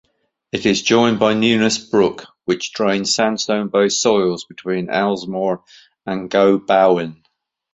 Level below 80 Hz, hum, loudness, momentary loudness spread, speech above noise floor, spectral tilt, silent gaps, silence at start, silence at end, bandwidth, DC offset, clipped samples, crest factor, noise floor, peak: -56 dBFS; none; -17 LUFS; 12 LU; 51 dB; -4 dB/octave; none; 0.55 s; 0.6 s; 8.4 kHz; under 0.1%; under 0.1%; 16 dB; -68 dBFS; 0 dBFS